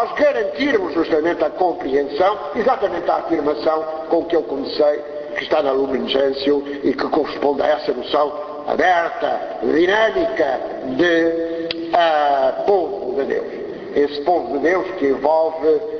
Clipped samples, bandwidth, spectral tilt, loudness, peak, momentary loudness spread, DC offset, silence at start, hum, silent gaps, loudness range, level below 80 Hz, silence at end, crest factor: under 0.1%; 6.6 kHz; -5.5 dB/octave; -19 LUFS; 0 dBFS; 7 LU; under 0.1%; 0 s; none; none; 2 LU; -52 dBFS; 0 s; 18 dB